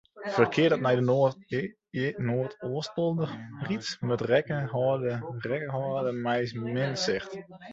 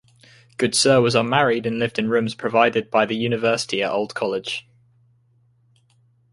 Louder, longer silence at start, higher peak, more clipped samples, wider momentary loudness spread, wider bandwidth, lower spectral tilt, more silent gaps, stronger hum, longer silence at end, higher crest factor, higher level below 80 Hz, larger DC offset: second, -29 LUFS vs -20 LUFS; second, 0.15 s vs 0.6 s; second, -8 dBFS vs -2 dBFS; neither; about the same, 10 LU vs 9 LU; second, 8 kHz vs 11.5 kHz; first, -6 dB/octave vs -4 dB/octave; neither; neither; second, 0 s vs 1.7 s; about the same, 20 dB vs 20 dB; about the same, -66 dBFS vs -62 dBFS; neither